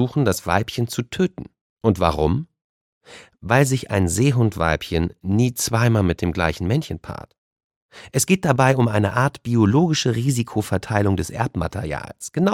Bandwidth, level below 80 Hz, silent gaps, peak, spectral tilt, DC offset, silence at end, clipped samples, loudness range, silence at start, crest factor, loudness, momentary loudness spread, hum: 16.5 kHz; -40 dBFS; 1.61-1.77 s, 2.61-3.01 s, 7.38-7.56 s, 7.64-7.70 s, 7.76-7.89 s; 0 dBFS; -5.5 dB/octave; under 0.1%; 0 s; under 0.1%; 3 LU; 0 s; 20 dB; -20 LUFS; 10 LU; none